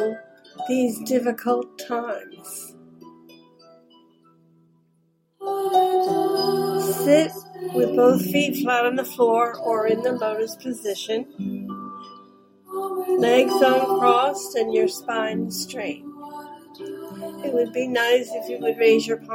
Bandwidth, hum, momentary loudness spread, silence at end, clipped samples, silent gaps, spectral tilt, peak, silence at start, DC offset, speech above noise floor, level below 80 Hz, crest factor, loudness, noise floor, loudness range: 16.5 kHz; none; 18 LU; 0 s; under 0.1%; none; -4.5 dB/octave; -4 dBFS; 0 s; under 0.1%; 44 dB; -72 dBFS; 20 dB; -22 LUFS; -65 dBFS; 9 LU